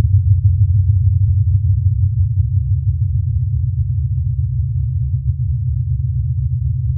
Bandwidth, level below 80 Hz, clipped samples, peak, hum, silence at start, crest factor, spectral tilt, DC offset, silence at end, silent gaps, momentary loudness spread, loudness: 0.3 kHz; -24 dBFS; under 0.1%; -2 dBFS; none; 0 s; 12 dB; -16 dB/octave; under 0.1%; 0 s; none; 5 LU; -17 LUFS